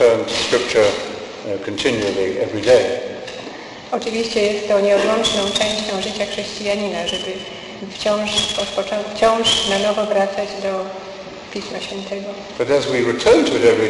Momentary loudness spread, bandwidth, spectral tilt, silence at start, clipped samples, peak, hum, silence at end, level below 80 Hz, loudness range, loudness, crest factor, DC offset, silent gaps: 15 LU; 12 kHz; -3 dB/octave; 0 s; under 0.1%; -2 dBFS; none; 0 s; -48 dBFS; 3 LU; -18 LUFS; 16 dB; under 0.1%; none